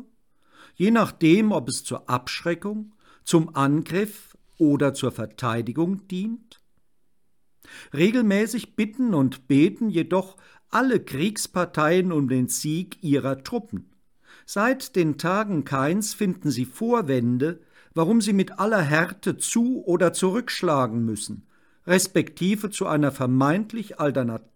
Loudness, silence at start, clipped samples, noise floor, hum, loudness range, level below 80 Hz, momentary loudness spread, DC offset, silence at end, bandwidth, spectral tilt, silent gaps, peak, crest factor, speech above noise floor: -23 LUFS; 0 s; under 0.1%; -75 dBFS; none; 3 LU; -64 dBFS; 10 LU; under 0.1%; 0.15 s; 19 kHz; -5.5 dB/octave; none; -6 dBFS; 18 dB; 52 dB